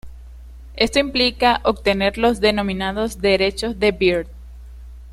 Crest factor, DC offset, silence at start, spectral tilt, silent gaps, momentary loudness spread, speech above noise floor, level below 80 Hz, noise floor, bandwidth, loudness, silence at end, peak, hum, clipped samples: 18 dB; under 0.1%; 0.05 s; -4.5 dB/octave; none; 6 LU; 20 dB; -36 dBFS; -38 dBFS; 14 kHz; -18 LUFS; 0 s; -2 dBFS; none; under 0.1%